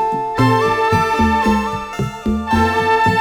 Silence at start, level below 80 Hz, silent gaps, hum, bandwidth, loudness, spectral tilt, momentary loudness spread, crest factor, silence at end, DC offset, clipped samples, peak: 0 s; -32 dBFS; none; none; 18.5 kHz; -16 LUFS; -6 dB/octave; 8 LU; 14 dB; 0 s; under 0.1%; under 0.1%; -2 dBFS